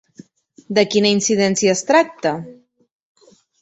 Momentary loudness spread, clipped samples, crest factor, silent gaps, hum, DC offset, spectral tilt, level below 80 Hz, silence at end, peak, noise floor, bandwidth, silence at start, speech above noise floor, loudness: 8 LU; under 0.1%; 18 dB; none; none; under 0.1%; -3.5 dB/octave; -62 dBFS; 1.1 s; -2 dBFS; -48 dBFS; 8.2 kHz; 0.7 s; 31 dB; -17 LUFS